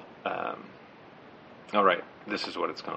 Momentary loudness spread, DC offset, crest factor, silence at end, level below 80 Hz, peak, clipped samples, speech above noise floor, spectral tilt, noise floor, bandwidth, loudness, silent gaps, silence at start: 26 LU; under 0.1%; 22 dB; 0 s; -76 dBFS; -10 dBFS; under 0.1%; 22 dB; -5 dB/octave; -51 dBFS; 8.8 kHz; -30 LUFS; none; 0 s